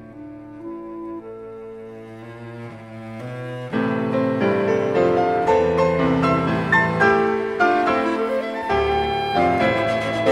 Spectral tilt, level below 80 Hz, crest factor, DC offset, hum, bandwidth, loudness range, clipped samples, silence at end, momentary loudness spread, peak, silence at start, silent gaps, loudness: -7 dB/octave; -46 dBFS; 18 dB; under 0.1%; none; 12 kHz; 15 LU; under 0.1%; 0 s; 19 LU; -4 dBFS; 0 s; none; -19 LUFS